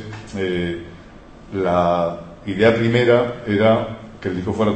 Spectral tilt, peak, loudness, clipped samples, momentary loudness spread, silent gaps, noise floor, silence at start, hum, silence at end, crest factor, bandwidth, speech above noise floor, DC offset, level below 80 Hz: -7 dB/octave; -2 dBFS; -19 LUFS; under 0.1%; 15 LU; none; -41 dBFS; 0 s; none; 0 s; 18 dB; 8.6 kHz; 23 dB; under 0.1%; -46 dBFS